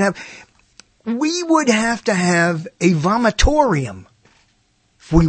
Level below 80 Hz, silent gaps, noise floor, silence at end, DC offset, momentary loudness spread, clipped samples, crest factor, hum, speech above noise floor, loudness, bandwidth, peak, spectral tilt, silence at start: -30 dBFS; none; -61 dBFS; 0 s; under 0.1%; 13 LU; under 0.1%; 18 dB; none; 44 dB; -17 LUFS; 8.8 kHz; 0 dBFS; -5 dB/octave; 0 s